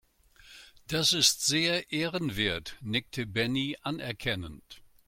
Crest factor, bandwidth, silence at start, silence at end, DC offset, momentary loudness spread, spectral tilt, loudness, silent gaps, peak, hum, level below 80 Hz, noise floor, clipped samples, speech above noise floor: 24 dB; 16.5 kHz; 0.45 s; 0.25 s; under 0.1%; 12 LU; -2.5 dB/octave; -28 LUFS; none; -8 dBFS; none; -56 dBFS; -58 dBFS; under 0.1%; 28 dB